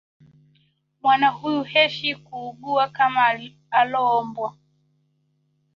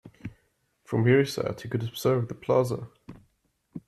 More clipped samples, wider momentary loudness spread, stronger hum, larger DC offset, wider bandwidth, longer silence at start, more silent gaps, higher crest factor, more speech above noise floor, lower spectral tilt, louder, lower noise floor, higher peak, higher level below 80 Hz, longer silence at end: neither; second, 13 LU vs 22 LU; neither; neither; second, 7 kHz vs 14.5 kHz; first, 1.05 s vs 0.05 s; neither; about the same, 20 dB vs 18 dB; about the same, 47 dB vs 45 dB; second, -5 dB/octave vs -6.5 dB/octave; first, -21 LUFS vs -26 LUFS; about the same, -68 dBFS vs -71 dBFS; first, -4 dBFS vs -10 dBFS; second, -70 dBFS vs -60 dBFS; first, 1.25 s vs 0.1 s